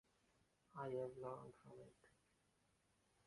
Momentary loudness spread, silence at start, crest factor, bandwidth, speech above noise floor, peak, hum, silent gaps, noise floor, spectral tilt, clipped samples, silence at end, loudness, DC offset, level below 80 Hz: 16 LU; 0.75 s; 20 dB; 11 kHz; 30 dB; -36 dBFS; none; none; -82 dBFS; -7.5 dB/octave; under 0.1%; 1.15 s; -52 LUFS; under 0.1%; -86 dBFS